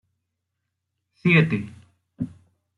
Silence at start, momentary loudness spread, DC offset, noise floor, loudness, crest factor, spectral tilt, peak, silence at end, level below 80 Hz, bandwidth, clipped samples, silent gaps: 1.25 s; 16 LU; under 0.1%; -80 dBFS; -21 LUFS; 22 dB; -8 dB/octave; -6 dBFS; 0.5 s; -64 dBFS; 5.4 kHz; under 0.1%; none